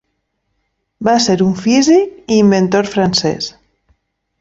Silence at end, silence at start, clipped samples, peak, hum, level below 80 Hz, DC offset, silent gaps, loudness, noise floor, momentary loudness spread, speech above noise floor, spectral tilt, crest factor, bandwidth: 0.9 s; 1 s; under 0.1%; -2 dBFS; none; -50 dBFS; under 0.1%; none; -13 LUFS; -69 dBFS; 9 LU; 56 dB; -5 dB/octave; 14 dB; 8 kHz